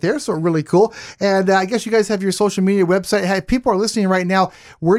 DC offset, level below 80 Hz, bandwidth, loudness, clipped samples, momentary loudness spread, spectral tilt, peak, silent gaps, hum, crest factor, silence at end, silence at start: under 0.1%; -44 dBFS; 14.5 kHz; -17 LUFS; under 0.1%; 4 LU; -5.5 dB/octave; -2 dBFS; none; none; 14 dB; 0 s; 0.05 s